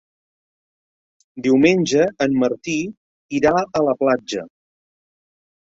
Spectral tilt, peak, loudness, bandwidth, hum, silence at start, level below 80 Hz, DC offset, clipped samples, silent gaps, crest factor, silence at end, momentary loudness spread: -5.5 dB/octave; -2 dBFS; -19 LUFS; 7.8 kHz; none; 1.35 s; -56 dBFS; under 0.1%; under 0.1%; 2.97-3.29 s; 18 dB; 1.3 s; 12 LU